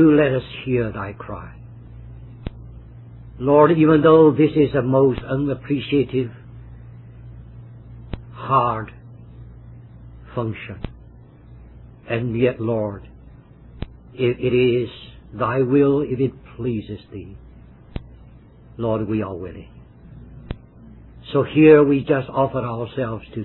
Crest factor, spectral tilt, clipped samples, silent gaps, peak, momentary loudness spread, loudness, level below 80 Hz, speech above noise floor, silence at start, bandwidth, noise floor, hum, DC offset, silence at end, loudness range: 20 dB; -11.5 dB/octave; under 0.1%; none; -2 dBFS; 27 LU; -19 LUFS; -44 dBFS; 27 dB; 0 s; 4.2 kHz; -45 dBFS; none; under 0.1%; 0 s; 13 LU